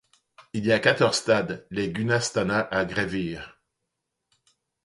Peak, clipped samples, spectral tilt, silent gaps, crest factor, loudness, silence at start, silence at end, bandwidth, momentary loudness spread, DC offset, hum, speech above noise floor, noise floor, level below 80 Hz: -6 dBFS; under 0.1%; -4.5 dB/octave; none; 20 dB; -25 LUFS; 0.4 s; 1.35 s; 11.5 kHz; 12 LU; under 0.1%; none; 57 dB; -81 dBFS; -56 dBFS